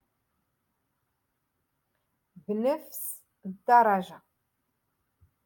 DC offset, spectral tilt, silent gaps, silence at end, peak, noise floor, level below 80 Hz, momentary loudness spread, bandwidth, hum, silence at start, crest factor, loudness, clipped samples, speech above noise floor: under 0.1%; -5 dB/octave; none; 1.3 s; -8 dBFS; -79 dBFS; -78 dBFS; 22 LU; 17.5 kHz; none; 2.5 s; 22 dB; -27 LUFS; under 0.1%; 53 dB